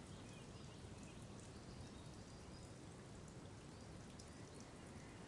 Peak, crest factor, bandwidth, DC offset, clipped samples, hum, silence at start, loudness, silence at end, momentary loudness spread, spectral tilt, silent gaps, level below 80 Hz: -40 dBFS; 16 dB; 11.5 kHz; under 0.1%; under 0.1%; none; 0 s; -57 LUFS; 0 s; 1 LU; -5 dB/octave; none; -68 dBFS